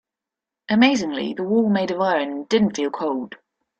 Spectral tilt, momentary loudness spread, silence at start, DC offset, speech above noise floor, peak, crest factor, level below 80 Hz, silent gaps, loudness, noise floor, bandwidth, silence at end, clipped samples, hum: -5 dB/octave; 9 LU; 0.7 s; under 0.1%; 67 dB; -4 dBFS; 18 dB; -62 dBFS; none; -21 LUFS; -87 dBFS; 8.4 kHz; 0.45 s; under 0.1%; none